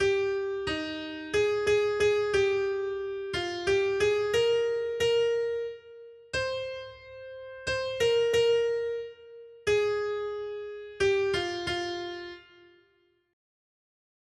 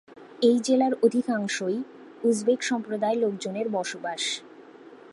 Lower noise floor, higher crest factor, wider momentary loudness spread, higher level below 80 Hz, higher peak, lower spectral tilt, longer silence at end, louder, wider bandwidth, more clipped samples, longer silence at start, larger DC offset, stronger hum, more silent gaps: first, -69 dBFS vs -48 dBFS; about the same, 14 dB vs 18 dB; first, 16 LU vs 8 LU; first, -58 dBFS vs -80 dBFS; second, -14 dBFS vs -8 dBFS; about the same, -4 dB/octave vs -4 dB/octave; first, 1.9 s vs 0.15 s; about the same, -28 LUFS vs -26 LUFS; about the same, 12.5 kHz vs 11.5 kHz; neither; about the same, 0 s vs 0.1 s; neither; neither; neither